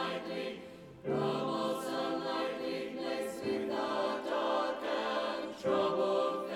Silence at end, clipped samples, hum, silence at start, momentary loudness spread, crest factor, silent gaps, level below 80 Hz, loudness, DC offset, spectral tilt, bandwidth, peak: 0 s; under 0.1%; none; 0 s; 7 LU; 14 dB; none; -72 dBFS; -35 LUFS; under 0.1%; -5 dB/octave; 16.5 kHz; -20 dBFS